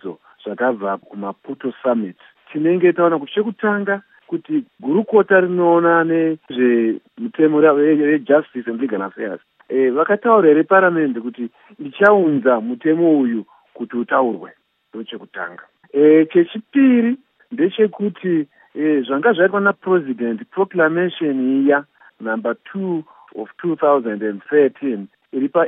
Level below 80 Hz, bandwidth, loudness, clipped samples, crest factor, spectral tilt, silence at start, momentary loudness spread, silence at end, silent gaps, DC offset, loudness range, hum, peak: -80 dBFS; 3.9 kHz; -17 LUFS; under 0.1%; 18 dB; -9.5 dB/octave; 0.05 s; 17 LU; 0 s; none; under 0.1%; 5 LU; none; 0 dBFS